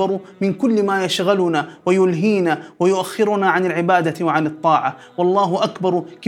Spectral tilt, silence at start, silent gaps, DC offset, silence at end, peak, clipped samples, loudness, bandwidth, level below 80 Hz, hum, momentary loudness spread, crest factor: -6 dB/octave; 0 s; none; under 0.1%; 0 s; -2 dBFS; under 0.1%; -18 LUFS; 15.5 kHz; -72 dBFS; none; 5 LU; 16 dB